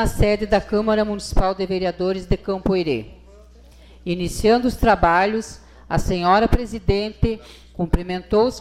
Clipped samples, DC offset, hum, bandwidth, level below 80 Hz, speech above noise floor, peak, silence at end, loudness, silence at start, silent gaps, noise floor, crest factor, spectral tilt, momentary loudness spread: under 0.1%; under 0.1%; none; 15 kHz; -28 dBFS; 26 dB; -4 dBFS; 0 s; -20 LUFS; 0 s; none; -46 dBFS; 16 dB; -6 dB/octave; 10 LU